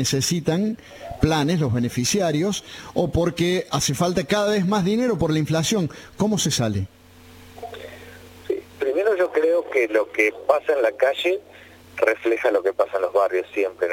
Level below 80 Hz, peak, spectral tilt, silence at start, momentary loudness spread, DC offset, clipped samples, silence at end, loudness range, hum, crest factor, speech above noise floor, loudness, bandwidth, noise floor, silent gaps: -46 dBFS; -2 dBFS; -4.5 dB/octave; 0 s; 10 LU; under 0.1%; under 0.1%; 0 s; 4 LU; none; 20 dB; 25 dB; -22 LUFS; 17 kHz; -46 dBFS; none